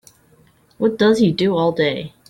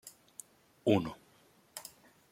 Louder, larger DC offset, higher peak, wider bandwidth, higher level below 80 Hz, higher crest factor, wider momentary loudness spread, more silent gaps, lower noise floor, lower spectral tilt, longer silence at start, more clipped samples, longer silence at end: first, -17 LUFS vs -33 LUFS; neither; first, -4 dBFS vs -14 dBFS; second, 12 kHz vs 16.5 kHz; first, -56 dBFS vs -70 dBFS; second, 14 dB vs 24 dB; second, 7 LU vs 21 LU; neither; second, -54 dBFS vs -66 dBFS; about the same, -6.5 dB/octave vs -6 dB/octave; first, 0.8 s vs 0.05 s; neither; second, 0.2 s vs 0.5 s